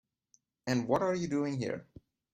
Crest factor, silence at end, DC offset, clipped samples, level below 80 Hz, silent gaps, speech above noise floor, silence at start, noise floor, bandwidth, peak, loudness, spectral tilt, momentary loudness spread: 20 dB; 0.5 s; under 0.1%; under 0.1%; -68 dBFS; none; 40 dB; 0.65 s; -72 dBFS; 13 kHz; -14 dBFS; -33 LUFS; -6 dB/octave; 11 LU